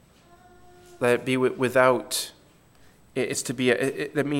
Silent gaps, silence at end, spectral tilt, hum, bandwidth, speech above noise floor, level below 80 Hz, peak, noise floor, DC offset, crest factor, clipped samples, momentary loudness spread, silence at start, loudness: none; 0 s; -4 dB/octave; none; 17 kHz; 32 dB; -64 dBFS; -4 dBFS; -56 dBFS; under 0.1%; 22 dB; under 0.1%; 9 LU; 0.9 s; -24 LUFS